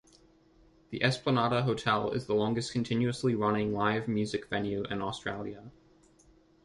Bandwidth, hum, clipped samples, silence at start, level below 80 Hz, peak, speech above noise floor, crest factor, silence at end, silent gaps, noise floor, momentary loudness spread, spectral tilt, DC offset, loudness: 11.5 kHz; none; under 0.1%; 0.9 s; -60 dBFS; -12 dBFS; 32 dB; 20 dB; 0.95 s; none; -62 dBFS; 9 LU; -6 dB/octave; under 0.1%; -31 LUFS